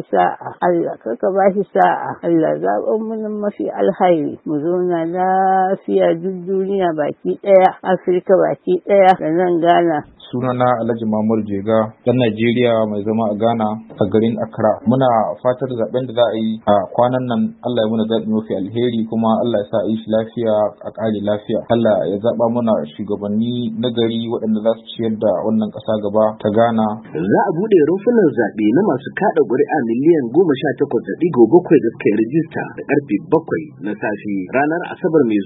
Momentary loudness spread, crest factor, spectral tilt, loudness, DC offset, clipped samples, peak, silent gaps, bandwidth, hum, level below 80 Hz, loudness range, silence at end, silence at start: 7 LU; 16 dB; -10 dB/octave; -17 LUFS; under 0.1%; under 0.1%; 0 dBFS; none; 4.1 kHz; none; -58 dBFS; 3 LU; 0 s; 0 s